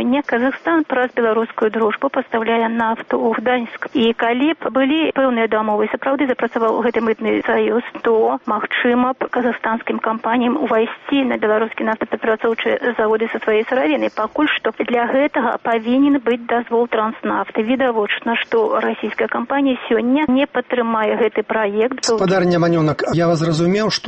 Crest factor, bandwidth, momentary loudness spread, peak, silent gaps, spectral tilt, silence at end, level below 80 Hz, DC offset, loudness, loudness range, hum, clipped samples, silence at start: 12 dB; 8.4 kHz; 4 LU; -6 dBFS; none; -5.5 dB/octave; 0 s; -56 dBFS; under 0.1%; -18 LUFS; 1 LU; none; under 0.1%; 0 s